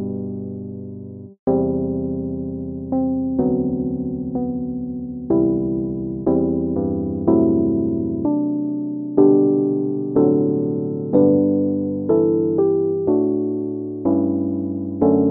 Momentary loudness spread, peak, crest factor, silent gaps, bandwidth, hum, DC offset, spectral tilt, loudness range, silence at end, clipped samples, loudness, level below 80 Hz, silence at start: 11 LU; -2 dBFS; 18 dB; 1.39-1.47 s; 1.8 kHz; none; under 0.1%; -15 dB/octave; 5 LU; 0 s; under 0.1%; -20 LUFS; -46 dBFS; 0 s